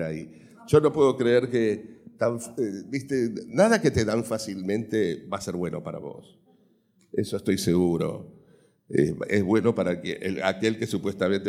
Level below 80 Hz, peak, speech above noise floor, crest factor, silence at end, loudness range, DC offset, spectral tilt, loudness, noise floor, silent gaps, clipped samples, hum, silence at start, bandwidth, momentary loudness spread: -56 dBFS; -6 dBFS; 38 dB; 20 dB; 0 s; 5 LU; under 0.1%; -6 dB/octave; -25 LUFS; -63 dBFS; none; under 0.1%; none; 0 s; 16 kHz; 12 LU